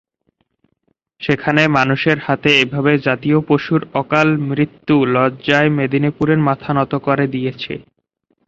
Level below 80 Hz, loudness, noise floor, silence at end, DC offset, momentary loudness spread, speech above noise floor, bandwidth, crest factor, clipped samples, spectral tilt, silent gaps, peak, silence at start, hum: -52 dBFS; -16 LUFS; -66 dBFS; 0.65 s; under 0.1%; 7 LU; 51 dB; 7.6 kHz; 16 dB; under 0.1%; -7 dB/octave; none; 0 dBFS; 1.2 s; none